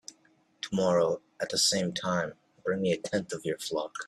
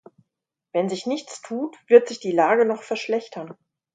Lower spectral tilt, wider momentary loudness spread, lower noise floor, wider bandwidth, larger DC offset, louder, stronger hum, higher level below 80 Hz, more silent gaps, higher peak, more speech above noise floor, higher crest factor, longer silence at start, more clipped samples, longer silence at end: second, -3.5 dB/octave vs -5 dB/octave; second, 11 LU vs 16 LU; second, -66 dBFS vs -84 dBFS; first, 13.5 kHz vs 9.2 kHz; neither; second, -30 LUFS vs -22 LUFS; neither; first, -68 dBFS vs -78 dBFS; neither; second, -12 dBFS vs 0 dBFS; second, 36 dB vs 62 dB; about the same, 18 dB vs 22 dB; second, 0.1 s vs 0.75 s; neither; second, 0 s vs 0.4 s